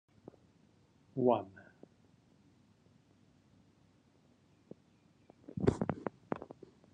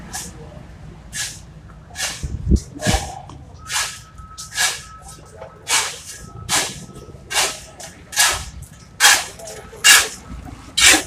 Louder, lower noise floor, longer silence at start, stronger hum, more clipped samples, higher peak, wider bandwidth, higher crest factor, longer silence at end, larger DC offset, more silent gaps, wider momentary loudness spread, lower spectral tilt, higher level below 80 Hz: second, -36 LUFS vs -17 LUFS; first, -68 dBFS vs -40 dBFS; first, 1.15 s vs 0 s; neither; neither; second, -14 dBFS vs 0 dBFS; second, 9.6 kHz vs 16 kHz; first, 28 dB vs 22 dB; first, 0.5 s vs 0 s; neither; neither; about the same, 27 LU vs 26 LU; first, -8.5 dB/octave vs -1 dB/octave; second, -64 dBFS vs -34 dBFS